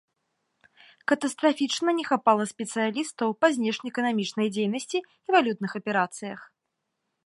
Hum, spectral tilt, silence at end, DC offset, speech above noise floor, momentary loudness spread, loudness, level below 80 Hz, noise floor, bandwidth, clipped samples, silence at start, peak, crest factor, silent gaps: none; -4 dB/octave; 0.8 s; under 0.1%; 55 dB; 9 LU; -26 LUFS; -80 dBFS; -81 dBFS; 11.5 kHz; under 0.1%; 1.1 s; -6 dBFS; 20 dB; none